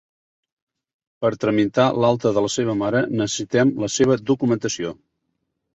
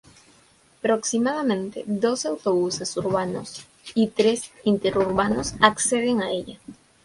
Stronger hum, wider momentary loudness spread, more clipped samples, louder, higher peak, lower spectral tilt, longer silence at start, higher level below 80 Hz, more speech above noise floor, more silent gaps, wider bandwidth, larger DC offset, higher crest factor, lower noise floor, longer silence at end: neither; second, 6 LU vs 10 LU; neither; first, -20 LUFS vs -23 LUFS; second, -4 dBFS vs 0 dBFS; about the same, -5 dB/octave vs -4 dB/octave; first, 1.2 s vs 0.85 s; about the same, -56 dBFS vs -54 dBFS; first, 55 dB vs 34 dB; neither; second, 8.2 kHz vs 11.5 kHz; neither; second, 18 dB vs 24 dB; first, -75 dBFS vs -57 dBFS; first, 0.8 s vs 0.3 s